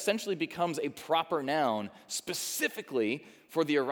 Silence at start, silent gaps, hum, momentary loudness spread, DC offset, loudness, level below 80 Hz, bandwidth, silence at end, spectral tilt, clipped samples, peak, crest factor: 0 s; none; none; 7 LU; under 0.1%; -32 LUFS; -80 dBFS; over 20 kHz; 0 s; -3.5 dB/octave; under 0.1%; -14 dBFS; 18 dB